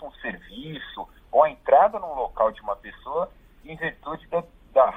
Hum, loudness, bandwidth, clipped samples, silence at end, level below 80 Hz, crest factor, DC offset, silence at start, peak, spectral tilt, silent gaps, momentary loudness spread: none; -24 LUFS; 3.9 kHz; under 0.1%; 0 s; -52 dBFS; 20 dB; under 0.1%; 0 s; -4 dBFS; -7 dB/octave; none; 19 LU